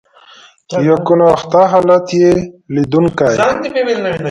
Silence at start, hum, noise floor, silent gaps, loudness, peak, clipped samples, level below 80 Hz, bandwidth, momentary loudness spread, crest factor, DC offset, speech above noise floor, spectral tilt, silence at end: 0.7 s; none; -42 dBFS; none; -12 LUFS; 0 dBFS; under 0.1%; -46 dBFS; 10.5 kHz; 7 LU; 12 dB; under 0.1%; 31 dB; -6.5 dB/octave; 0 s